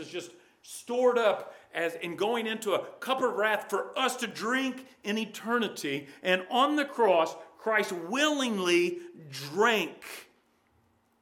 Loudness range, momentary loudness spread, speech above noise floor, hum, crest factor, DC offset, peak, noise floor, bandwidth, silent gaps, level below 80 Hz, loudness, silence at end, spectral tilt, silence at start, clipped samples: 3 LU; 15 LU; 39 dB; none; 20 dB; under 0.1%; -10 dBFS; -69 dBFS; 18 kHz; none; -84 dBFS; -29 LUFS; 1 s; -3.5 dB/octave; 0 s; under 0.1%